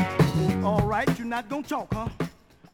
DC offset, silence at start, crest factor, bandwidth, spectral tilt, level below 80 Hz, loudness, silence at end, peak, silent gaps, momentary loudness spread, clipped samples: under 0.1%; 0 s; 18 dB; 18 kHz; -7 dB/octave; -44 dBFS; -27 LUFS; 0.45 s; -8 dBFS; none; 10 LU; under 0.1%